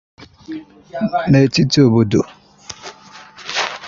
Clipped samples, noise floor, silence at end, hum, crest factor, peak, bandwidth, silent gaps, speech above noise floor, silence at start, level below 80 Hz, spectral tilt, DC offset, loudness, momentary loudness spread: under 0.1%; -40 dBFS; 0 s; none; 16 dB; -2 dBFS; 7.6 kHz; none; 26 dB; 0.2 s; -48 dBFS; -6 dB/octave; under 0.1%; -15 LUFS; 20 LU